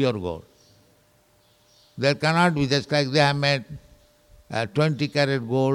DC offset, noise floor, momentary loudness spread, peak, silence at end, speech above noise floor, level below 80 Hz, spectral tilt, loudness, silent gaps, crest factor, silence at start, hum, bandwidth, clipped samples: under 0.1%; -60 dBFS; 13 LU; -6 dBFS; 0 s; 38 dB; -56 dBFS; -5.5 dB/octave; -23 LUFS; none; 20 dB; 0 s; none; 12 kHz; under 0.1%